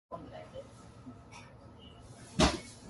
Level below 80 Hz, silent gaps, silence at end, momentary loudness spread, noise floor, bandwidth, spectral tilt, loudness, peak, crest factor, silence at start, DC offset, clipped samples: -48 dBFS; none; 0 s; 24 LU; -53 dBFS; 11.5 kHz; -4 dB/octave; -32 LUFS; -12 dBFS; 26 dB; 0.1 s; under 0.1%; under 0.1%